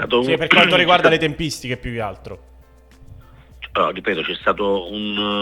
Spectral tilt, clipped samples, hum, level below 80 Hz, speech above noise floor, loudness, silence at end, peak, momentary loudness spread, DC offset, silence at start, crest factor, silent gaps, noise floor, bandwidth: -4.5 dB/octave; under 0.1%; none; -44 dBFS; 29 dB; -17 LUFS; 0 s; 0 dBFS; 15 LU; under 0.1%; 0 s; 20 dB; none; -47 dBFS; 17 kHz